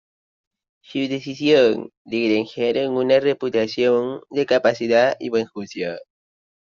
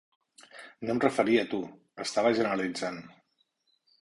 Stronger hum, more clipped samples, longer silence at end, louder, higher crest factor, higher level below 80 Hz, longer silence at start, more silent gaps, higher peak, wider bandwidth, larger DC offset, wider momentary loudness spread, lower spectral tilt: neither; neither; second, 0.7 s vs 0.95 s; first, -20 LUFS vs -29 LUFS; about the same, 18 dB vs 22 dB; about the same, -66 dBFS vs -70 dBFS; first, 0.9 s vs 0.55 s; first, 1.97-2.05 s vs none; first, -4 dBFS vs -10 dBFS; second, 7.4 kHz vs 11.5 kHz; neither; second, 11 LU vs 18 LU; about the same, -3.5 dB/octave vs -4.5 dB/octave